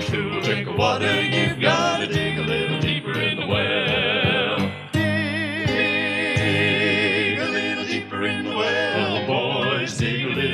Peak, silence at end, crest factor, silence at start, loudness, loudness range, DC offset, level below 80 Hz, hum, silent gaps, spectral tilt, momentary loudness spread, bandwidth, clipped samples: -6 dBFS; 0 s; 16 dB; 0 s; -21 LUFS; 1 LU; under 0.1%; -50 dBFS; none; none; -5 dB/octave; 5 LU; 13.5 kHz; under 0.1%